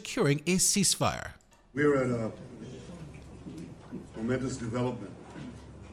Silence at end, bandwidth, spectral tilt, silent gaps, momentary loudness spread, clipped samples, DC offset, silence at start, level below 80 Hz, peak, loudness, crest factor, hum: 0 s; 16 kHz; -4 dB/octave; none; 21 LU; under 0.1%; under 0.1%; 0 s; -54 dBFS; -12 dBFS; -29 LUFS; 20 dB; none